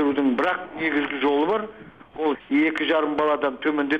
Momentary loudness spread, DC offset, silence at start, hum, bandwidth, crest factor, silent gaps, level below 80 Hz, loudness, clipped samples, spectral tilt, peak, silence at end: 6 LU; under 0.1%; 0 s; none; 5.6 kHz; 14 dB; none; -62 dBFS; -23 LUFS; under 0.1%; -6 dB/octave; -10 dBFS; 0 s